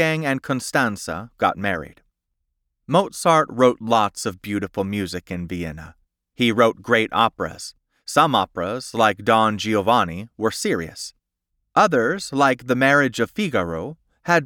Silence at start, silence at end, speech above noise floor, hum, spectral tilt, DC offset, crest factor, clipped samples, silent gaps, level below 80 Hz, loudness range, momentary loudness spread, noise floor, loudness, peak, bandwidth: 0 s; 0 s; 56 dB; none; -4.5 dB/octave; under 0.1%; 18 dB; under 0.1%; none; -54 dBFS; 3 LU; 13 LU; -76 dBFS; -20 LUFS; -2 dBFS; 18.5 kHz